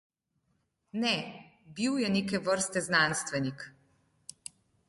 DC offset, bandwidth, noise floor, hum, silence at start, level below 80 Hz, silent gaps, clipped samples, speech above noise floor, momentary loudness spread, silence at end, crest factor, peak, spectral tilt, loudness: under 0.1%; 11.5 kHz; -77 dBFS; none; 0.95 s; -68 dBFS; none; under 0.1%; 47 dB; 22 LU; 1.2 s; 20 dB; -12 dBFS; -3.5 dB/octave; -30 LUFS